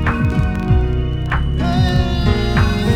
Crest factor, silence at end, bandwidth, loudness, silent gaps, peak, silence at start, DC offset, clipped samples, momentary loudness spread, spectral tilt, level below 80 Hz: 14 dB; 0 s; 12 kHz; -17 LUFS; none; -2 dBFS; 0 s; under 0.1%; under 0.1%; 4 LU; -7 dB/octave; -20 dBFS